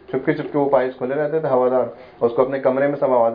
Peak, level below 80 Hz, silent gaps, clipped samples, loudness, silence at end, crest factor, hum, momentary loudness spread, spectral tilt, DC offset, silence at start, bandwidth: -2 dBFS; -60 dBFS; none; under 0.1%; -20 LUFS; 0 s; 18 dB; none; 5 LU; -10.5 dB/octave; under 0.1%; 0.1 s; 5 kHz